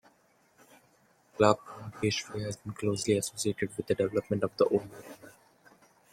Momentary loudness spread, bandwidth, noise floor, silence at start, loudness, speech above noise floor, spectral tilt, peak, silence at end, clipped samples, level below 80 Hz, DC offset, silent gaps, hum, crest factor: 21 LU; 16 kHz; -67 dBFS; 1.4 s; -30 LUFS; 37 dB; -5 dB/octave; -8 dBFS; 0.8 s; under 0.1%; -66 dBFS; under 0.1%; none; none; 26 dB